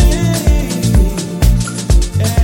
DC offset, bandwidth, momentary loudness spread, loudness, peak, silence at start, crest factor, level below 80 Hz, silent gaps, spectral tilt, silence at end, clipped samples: under 0.1%; 17 kHz; 2 LU; -14 LUFS; 0 dBFS; 0 s; 12 dB; -14 dBFS; none; -5.5 dB/octave; 0 s; under 0.1%